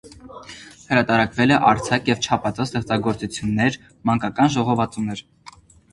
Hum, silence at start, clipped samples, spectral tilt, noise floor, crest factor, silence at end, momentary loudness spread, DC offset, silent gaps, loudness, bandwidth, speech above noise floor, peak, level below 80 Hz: none; 0.05 s; under 0.1%; -5.5 dB/octave; -47 dBFS; 20 dB; 0.45 s; 21 LU; under 0.1%; none; -20 LUFS; 11.5 kHz; 27 dB; 0 dBFS; -48 dBFS